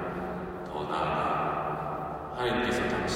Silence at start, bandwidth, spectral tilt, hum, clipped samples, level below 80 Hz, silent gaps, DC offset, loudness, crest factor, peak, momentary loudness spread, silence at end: 0 s; 16 kHz; -5.5 dB/octave; none; under 0.1%; -50 dBFS; none; under 0.1%; -31 LUFS; 14 dB; -16 dBFS; 8 LU; 0 s